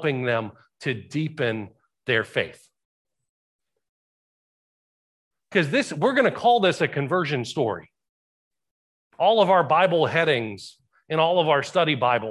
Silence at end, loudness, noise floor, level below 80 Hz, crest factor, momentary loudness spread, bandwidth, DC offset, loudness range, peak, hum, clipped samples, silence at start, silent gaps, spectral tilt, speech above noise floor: 0 s; -22 LUFS; under -90 dBFS; -66 dBFS; 18 dB; 13 LU; 12 kHz; under 0.1%; 10 LU; -6 dBFS; none; under 0.1%; 0 s; 2.85-3.05 s, 3.29-3.59 s, 3.89-5.31 s, 8.09-8.51 s, 8.71-9.10 s; -5.5 dB/octave; over 68 dB